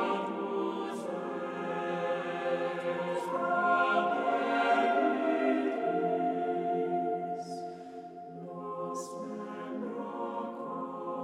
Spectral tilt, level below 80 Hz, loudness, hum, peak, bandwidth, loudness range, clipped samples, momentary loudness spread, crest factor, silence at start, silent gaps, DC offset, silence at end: -6 dB/octave; -82 dBFS; -32 LUFS; none; -16 dBFS; 12 kHz; 10 LU; under 0.1%; 13 LU; 16 dB; 0 s; none; under 0.1%; 0 s